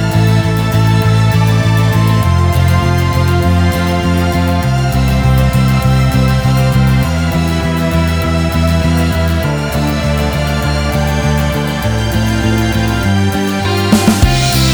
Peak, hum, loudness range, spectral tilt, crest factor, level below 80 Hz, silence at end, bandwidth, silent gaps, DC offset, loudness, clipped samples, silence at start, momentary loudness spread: 0 dBFS; none; 3 LU; -6 dB/octave; 10 dB; -20 dBFS; 0 s; over 20 kHz; none; under 0.1%; -12 LUFS; under 0.1%; 0 s; 4 LU